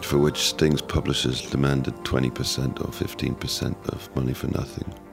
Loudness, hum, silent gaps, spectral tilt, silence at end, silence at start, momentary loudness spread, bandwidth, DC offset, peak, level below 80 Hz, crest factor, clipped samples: -25 LUFS; none; none; -5 dB/octave; 0 s; 0 s; 8 LU; 16 kHz; under 0.1%; -6 dBFS; -40 dBFS; 20 dB; under 0.1%